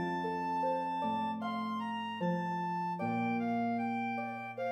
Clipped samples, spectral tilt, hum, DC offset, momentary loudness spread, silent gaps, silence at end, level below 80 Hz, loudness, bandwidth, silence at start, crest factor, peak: under 0.1%; -7.5 dB/octave; none; under 0.1%; 4 LU; none; 0 s; -82 dBFS; -35 LUFS; 9.4 kHz; 0 s; 12 dB; -22 dBFS